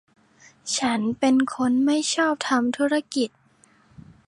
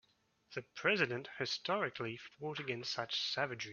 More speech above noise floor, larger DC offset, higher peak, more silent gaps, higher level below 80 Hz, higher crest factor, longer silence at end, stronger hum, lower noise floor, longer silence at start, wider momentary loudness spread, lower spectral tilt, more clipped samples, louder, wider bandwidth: about the same, 36 dB vs 35 dB; neither; first, -8 dBFS vs -18 dBFS; neither; first, -64 dBFS vs -80 dBFS; second, 16 dB vs 22 dB; first, 1 s vs 0 s; neither; second, -58 dBFS vs -74 dBFS; first, 0.65 s vs 0.5 s; second, 7 LU vs 12 LU; first, -3 dB/octave vs -1.5 dB/octave; neither; first, -23 LUFS vs -38 LUFS; first, 11.5 kHz vs 7 kHz